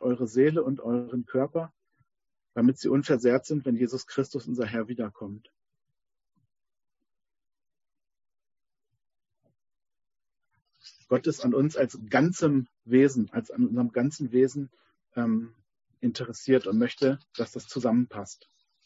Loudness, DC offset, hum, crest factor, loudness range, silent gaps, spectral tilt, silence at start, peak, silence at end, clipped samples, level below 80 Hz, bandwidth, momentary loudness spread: -27 LUFS; under 0.1%; none; 20 dB; 10 LU; none; -6.5 dB/octave; 0 s; -8 dBFS; 0.5 s; under 0.1%; -70 dBFS; 8 kHz; 11 LU